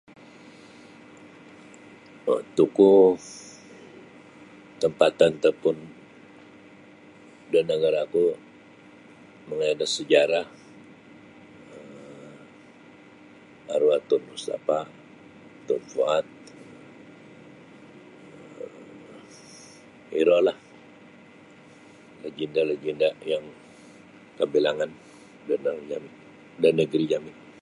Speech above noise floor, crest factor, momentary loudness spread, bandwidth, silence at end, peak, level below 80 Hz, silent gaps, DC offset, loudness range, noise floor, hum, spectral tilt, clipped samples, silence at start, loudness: 27 dB; 24 dB; 26 LU; 11 kHz; 0.3 s; -4 dBFS; -70 dBFS; none; under 0.1%; 9 LU; -50 dBFS; none; -5 dB/octave; under 0.1%; 2.25 s; -24 LUFS